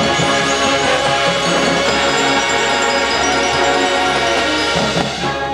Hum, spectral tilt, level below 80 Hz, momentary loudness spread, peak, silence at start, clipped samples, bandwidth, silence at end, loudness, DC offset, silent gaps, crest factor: none; -2.5 dB/octave; -40 dBFS; 1 LU; -2 dBFS; 0 s; under 0.1%; 14 kHz; 0 s; -14 LUFS; under 0.1%; none; 14 dB